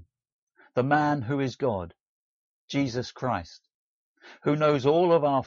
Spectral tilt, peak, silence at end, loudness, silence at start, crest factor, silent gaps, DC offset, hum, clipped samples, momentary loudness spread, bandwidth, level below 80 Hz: -5.5 dB/octave; -10 dBFS; 0 s; -26 LUFS; 0.75 s; 18 dB; 2.00-2.68 s, 3.74-4.15 s; under 0.1%; none; under 0.1%; 11 LU; 7.4 kHz; -62 dBFS